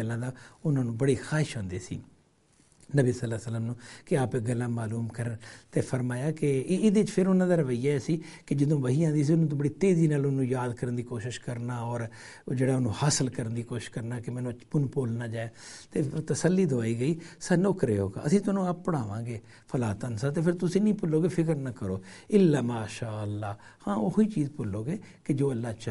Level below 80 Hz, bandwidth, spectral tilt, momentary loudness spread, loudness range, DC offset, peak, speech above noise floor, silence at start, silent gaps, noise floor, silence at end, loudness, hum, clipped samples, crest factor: -60 dBFS; 11.5 kHz; -7 dB/octave; 11 LU; 5 LU; under 0.1%; -10 dBFS; 36 dB; 0 s; none; -64 dBFS; 0 s; -29 LUFS; none; under 0.1%; 18 dB